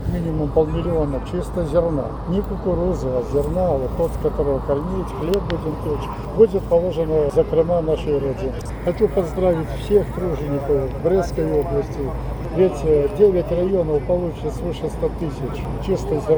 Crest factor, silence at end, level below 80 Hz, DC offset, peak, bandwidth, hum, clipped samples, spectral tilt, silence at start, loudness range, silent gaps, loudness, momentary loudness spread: 18 dB; 0 s; -30 dBFS; under 0.1%; -2 dBFS; over 20 kHz; none; under 0.1%; -8 dB/octave; 0 s; 2 LU; none; -21 LUFS; 9 LU